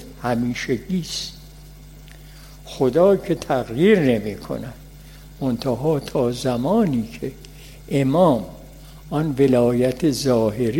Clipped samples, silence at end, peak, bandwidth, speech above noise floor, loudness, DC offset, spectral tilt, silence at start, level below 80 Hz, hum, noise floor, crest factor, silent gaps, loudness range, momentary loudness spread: under 0.1%; 0 s; -4 dBFS; 16.5 kHz; 22 dB; -20 LUFS; under 0.1%; -6.5 dB/octave; 0 s; -44 dBFS; 50 Hz at -40 dBFS; -41 dBFS; 18 dB; none; 3 LU; 16 LU